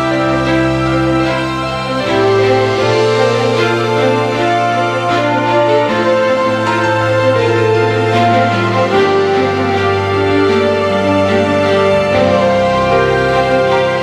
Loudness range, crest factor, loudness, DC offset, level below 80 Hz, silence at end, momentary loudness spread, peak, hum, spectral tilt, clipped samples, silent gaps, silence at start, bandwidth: 1 LU; 12 dB; -12 LUFS; under 0.1%; -38 dBFS; 0 s; 2 LU; 0 dBFS; none; -6 dB/octave; under 0.1%; none; 0 s; 12.5 kHz